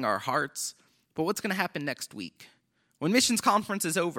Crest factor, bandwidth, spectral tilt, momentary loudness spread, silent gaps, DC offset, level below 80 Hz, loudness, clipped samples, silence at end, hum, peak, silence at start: 20 dB; 17.5 kHz; -3 dB/octave; 15 LU; none; under 0.1%; -74 dBFS; -28 LUFS; under 0.1%; 0 s; none; -10 dBFS; 0 s